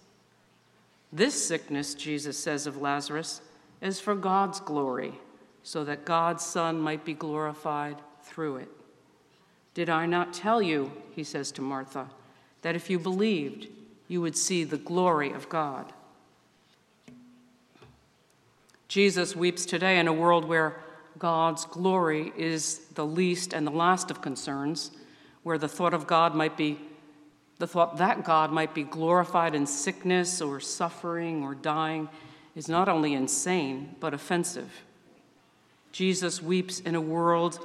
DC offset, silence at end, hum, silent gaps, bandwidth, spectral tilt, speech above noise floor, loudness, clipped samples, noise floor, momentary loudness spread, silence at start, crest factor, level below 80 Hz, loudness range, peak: under 0.1%; 0 s; none; none; 14 kHz; -4 dB/octave; 36 dB; -28 LUFS; under 0.1%; -64 dBFS; 14 LU; 1.1 s; 22 dB; -78 dBFS; 6 LU; -8 dBFS